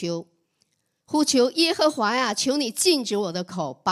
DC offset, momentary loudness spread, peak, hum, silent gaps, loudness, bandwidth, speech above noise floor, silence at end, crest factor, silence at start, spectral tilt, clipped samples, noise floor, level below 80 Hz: under 0.1%; 10 LU; -6 dBFS; none; none; -22 LUFS; 15 kHz; 48 dB; 0 s; 18 dB; 0 s; -3 dB/octave; under 0.1%; -71 dBFS; -72 dBFS